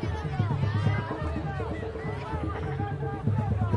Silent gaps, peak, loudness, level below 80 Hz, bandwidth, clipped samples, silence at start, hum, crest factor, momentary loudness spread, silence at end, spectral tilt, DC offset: none; -14 dBFS; -30 LUFS; -42 dBFS; 7.2 kHz; under 0.1%; 0 s; none; 16 dB; 6 LU; 0 s; -8.5 dB/octave; under 0.1%